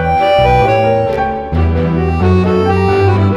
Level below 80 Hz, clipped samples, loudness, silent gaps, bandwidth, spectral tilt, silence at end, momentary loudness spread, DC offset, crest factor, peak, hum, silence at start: -24 dBFS; under 0.1%; -12 LUFS; none; 11 kHz; -8 dB/octave; 0 s; 5 LU; under 0.1%; 10 dB; 0 dBFS; none; 0 s